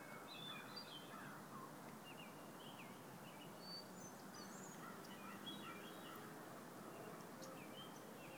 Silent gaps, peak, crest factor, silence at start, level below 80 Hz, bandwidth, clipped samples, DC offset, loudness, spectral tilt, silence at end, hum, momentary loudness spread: none; -42 dBFS; 14 dB; 0 s; -88 dBFS; 19 kHz; under 0.1%; under 0.1%; -55 LUFS; -3.5 dB/octave; 0 s; none; 4 LU